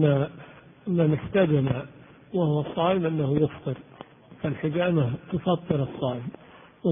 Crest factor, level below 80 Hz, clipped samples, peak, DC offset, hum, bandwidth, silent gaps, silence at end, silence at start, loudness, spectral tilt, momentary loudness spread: 18 dB; -54 dBFS; under 0.1%; -8 dBFS; under 0.1%; none; 3.7 kHz; none; 0 s; 0 s; -26 LUFS; -12 dB/octave; 13 LU